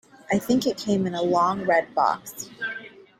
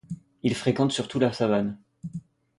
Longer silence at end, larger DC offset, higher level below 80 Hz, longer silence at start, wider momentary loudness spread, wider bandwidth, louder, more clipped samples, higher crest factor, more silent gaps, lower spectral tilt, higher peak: about the same, 0.3 s vs 0.4 s; neither; about the same, -62 dBFS vs -60 dBFS; first, 0.3 s vs 0.1 s; second, 11 LU vs 16 LU; first, 16 kHz vs 11.5 kHz; about the same, -24 LUFS vs -26 LUFS; neither; about the same, 18 dB vs 18 dB; neither; about the same, -5 dB/octave vs -6 dB/octave; about the same, -8 dBFS vs -8 dBFS